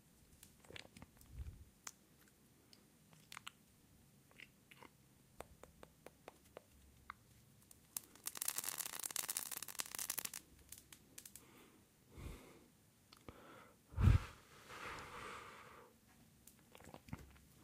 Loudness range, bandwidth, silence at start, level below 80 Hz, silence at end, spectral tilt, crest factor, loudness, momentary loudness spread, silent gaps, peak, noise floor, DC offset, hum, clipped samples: 18 LU; 16.5 kHz; 0.3 s; -54 dBFS; 0 s; -3.5 dB/octave; 32 dB; -45 LUFS; 25 LU; none; -16 dBFS; -70 dBFS; under 0.1%; none; under 0.1%